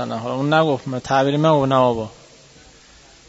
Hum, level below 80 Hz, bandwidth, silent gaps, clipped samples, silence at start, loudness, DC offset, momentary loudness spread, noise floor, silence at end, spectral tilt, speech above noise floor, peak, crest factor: none; -54 dBFS; 8 kHz; none; under 0.1%; 0 s; -18 LUFS; under 0.1%; 9 LU; -48 dBFS; 1.15 s; -6.5 dB/octave; 30 dB; -2 dBFS; 16 dB